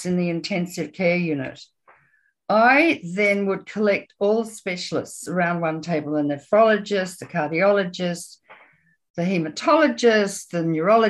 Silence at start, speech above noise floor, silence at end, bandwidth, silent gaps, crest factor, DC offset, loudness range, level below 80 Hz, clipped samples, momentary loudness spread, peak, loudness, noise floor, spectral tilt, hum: 0 s; 43 dB; 0 s; 12.5 kHz; 9.10-9.14 s; 16 dB; under 0.1%; 2 LU; -68 dBFS; under 0.1%; 11 LU; -4 dBFS; -21 LUFS; -64 dBFS; -5.5 dB/octave; none